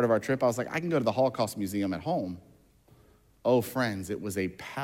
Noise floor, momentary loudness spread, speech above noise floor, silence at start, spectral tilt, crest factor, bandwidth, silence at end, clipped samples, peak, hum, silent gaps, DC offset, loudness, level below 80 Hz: -61 dBFS; 8 LU; 32 dB; 0 s; -6 dB/octave; 18 dB; 17 kHz; 0 s; under 0.1%; -12 dBFS; none; none; under 0.1%; -29 LUFS; -66 dBFS